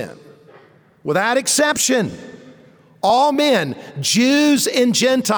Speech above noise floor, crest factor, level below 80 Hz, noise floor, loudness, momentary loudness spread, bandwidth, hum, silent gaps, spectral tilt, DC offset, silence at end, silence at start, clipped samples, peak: 33 dB; 12 dB; -60 dBFS; -49 dBFS; -16 LUFS; 12 LU; over 20 kHz; none; none; -3 dB/octave; under 0.1%; 0 s; 0 s; under 0.1%; -6 dBFS